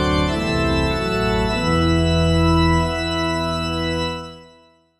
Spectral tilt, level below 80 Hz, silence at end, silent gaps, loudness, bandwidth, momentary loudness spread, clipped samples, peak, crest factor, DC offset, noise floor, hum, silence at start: -6 dB/octave; -28 dBFS; 0.55 s; none; -19 LUFS; 12.5 kHz; 6 LU; under 0.1%; -6 dBFS; 12 dB; 0.4%; -52 dBFS; none; 0 s